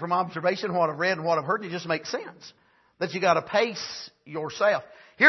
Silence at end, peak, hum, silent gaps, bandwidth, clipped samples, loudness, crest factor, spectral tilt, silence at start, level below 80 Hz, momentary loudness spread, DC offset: 0 s; -4 dBFS; none; none; 6.2 kHz; under 0.1%; -27 LUFS; 22 dB; -4.5 dB/octave; 0 s; -72 dBFS; 12 LU; under 0.1%